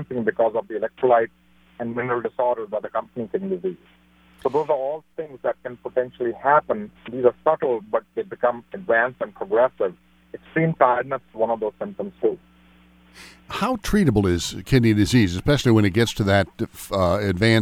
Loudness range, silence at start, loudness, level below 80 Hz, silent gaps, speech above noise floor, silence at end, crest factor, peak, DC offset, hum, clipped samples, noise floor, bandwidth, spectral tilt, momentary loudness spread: 7 LU; 0 s; -22 LUFS; -44 dBFS; none; 31 dB; 0 s; 20 dB; -4 dBFS; under 0.1%; none; under 0.1%; -53 dBFS; 16.5 kHz; -6 dB/octave; 12 LU